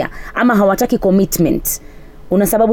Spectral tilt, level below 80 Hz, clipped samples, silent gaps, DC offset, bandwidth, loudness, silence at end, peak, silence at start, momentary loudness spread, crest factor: -5.5 dB/octave; -34 dBFS; under 0.1%; none; under 0.1%; over 20 kHz; -15 LUFS; 0 s; -4 dBFS; 0 s; 8 LU; 10 dB